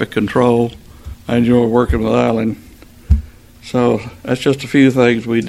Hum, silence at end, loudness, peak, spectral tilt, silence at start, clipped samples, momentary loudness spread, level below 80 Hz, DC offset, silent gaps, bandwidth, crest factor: none; 0 s; -15 LUFS; 0 dBFS; -7 dB/octave; 0 s; under 0.1%; 10 LU; -26 dBFS; under 0.1%; none; 14 kHz; 14 dB